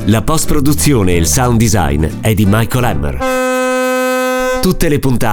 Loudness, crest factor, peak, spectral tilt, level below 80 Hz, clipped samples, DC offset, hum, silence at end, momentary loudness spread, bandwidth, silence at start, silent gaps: -13 LUFS; 12 dB; 0 dBFS; -5 dB/octave; -24 dBFS; under 0.1%; under 0.1%; none; 0 s; 4 LU; over 20 kHz; 0 s; none